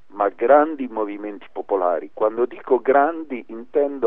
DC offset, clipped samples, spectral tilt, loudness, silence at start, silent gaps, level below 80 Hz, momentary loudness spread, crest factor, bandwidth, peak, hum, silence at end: 0.8%; under 0.1%; -8.5 dB/octave; -20 LUFS; 0.15 s; none; -70 dBFS; 16 LU; 18 dB; 3.8 kHz; -2 dBFS; none; 0 s